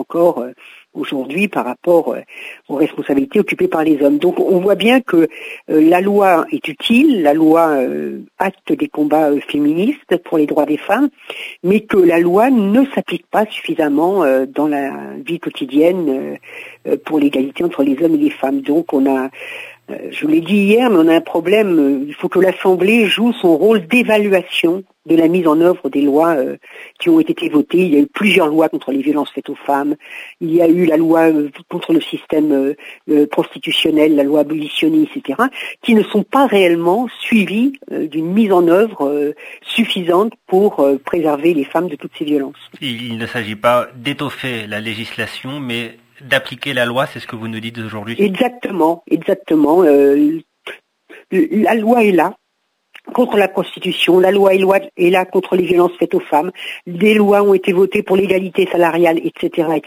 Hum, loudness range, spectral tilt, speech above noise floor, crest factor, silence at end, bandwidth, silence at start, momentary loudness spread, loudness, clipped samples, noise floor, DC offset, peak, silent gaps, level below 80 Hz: none; 5 LU; -6 dB/octave; 54 dB; 14 dB; 0.05 s; 16 kHz; 0 s; 12 LU; -14 LUFS; under 0.1%; -68 dBFS; under 0.1%; 0 dBFS; none; -60 dBFS